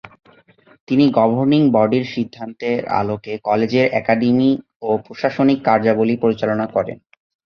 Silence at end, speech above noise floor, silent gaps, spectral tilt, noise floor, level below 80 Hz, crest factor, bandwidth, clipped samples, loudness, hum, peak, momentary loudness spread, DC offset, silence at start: 0.6 s; 35 dB; 0.80-0.87 s, 4.76-4.80 s; -8 dB/octave; -51 dBFS; -56 dBFS; 16 dB; 6.6 kHz; under 0.1%; -17 LUFS; none; -2 dBFS; 9 LU; under 0.1%; 0.05 s